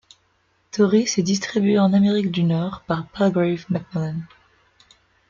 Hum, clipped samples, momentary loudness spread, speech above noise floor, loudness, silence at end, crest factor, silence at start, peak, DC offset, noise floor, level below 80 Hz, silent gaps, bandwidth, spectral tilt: none; under 0.1%; 10 LU; 45 dB; -20 LUFS; 1.05 s; 16 dB; 0.75 s; -6 dBFS; under 0.1%; -64 dBFS; -58 dBFS; none; 7.6 kHz; -6 dB/octave